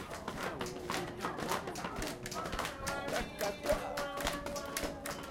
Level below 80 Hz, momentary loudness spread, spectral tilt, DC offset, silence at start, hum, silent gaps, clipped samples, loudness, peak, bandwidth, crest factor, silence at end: -52 dBFS; 5 LU; -3.5 dB/octave; under 0.1%; 0 s; none; none; under 0.1%; -38 LUFS; -18 dBFS; 17 kHz; 22 dB; 0 s